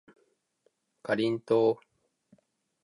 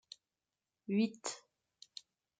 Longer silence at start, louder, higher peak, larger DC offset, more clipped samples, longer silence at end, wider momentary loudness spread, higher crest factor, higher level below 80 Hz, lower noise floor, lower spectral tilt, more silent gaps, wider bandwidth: first, 1.05 s vs 0.9 s; first, -28 LUFS vs -37 LUFS; first, -14 dBFS vs -22 dBFS; neither; neither; about the same, 1.1 s vs 1 s; second, 13 LU vs 20 LU; about the same, 18 dB vs 20 dB; first, -78 dBFS vs -90 dBFS; second, -73 dBFS vs under -90 dBFS; first, -7 dB/octave vs -4.5 dB/octave; neither; first, 11 kHz vs 9.6 kHz